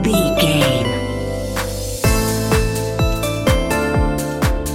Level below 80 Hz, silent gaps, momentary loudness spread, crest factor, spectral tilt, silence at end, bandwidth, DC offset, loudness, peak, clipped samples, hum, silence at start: -24 dBFS; none; 7 LU; 18 dB; -5 dB/octave; 0 s; 17 kHz; under 0.1%; -18 LUFS; 0 dBFS; under 0.1%; none; 0 s